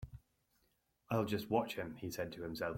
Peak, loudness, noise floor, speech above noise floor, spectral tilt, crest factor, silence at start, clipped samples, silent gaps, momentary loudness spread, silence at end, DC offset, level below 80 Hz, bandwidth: -20 dBFS; -40 LUFS; -79 dBFS; 40 dB; -6 dB/octave; 22 dB; 0 s; under 0.1%; none; 7 LU; 0 s; under 0.1%; -64 dBFS; 16.5 kHz